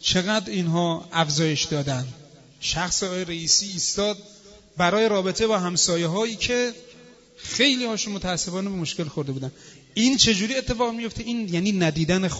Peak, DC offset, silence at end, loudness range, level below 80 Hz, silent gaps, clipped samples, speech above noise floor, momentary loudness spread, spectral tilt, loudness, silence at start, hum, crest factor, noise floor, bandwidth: -2 dBFS; under 0.1%; 0 s; 3 LU; -48 dBFS; none; under 0.1%; 26 dB; 11 LU; -3.5 dB/octave; -23 LUFS; 0 s; none; 22 dB; -49 dBFS; 8 kHz